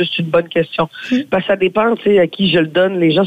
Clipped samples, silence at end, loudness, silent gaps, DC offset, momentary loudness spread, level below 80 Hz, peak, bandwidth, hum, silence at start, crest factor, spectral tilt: under 0.1%; 0 s; -15 LUFS; none; under 0.1%; 5 LU; -52 dBFS; -4 dBFS; 14.5 kHz; none; 0 s; 12 dB; -7 dB/octave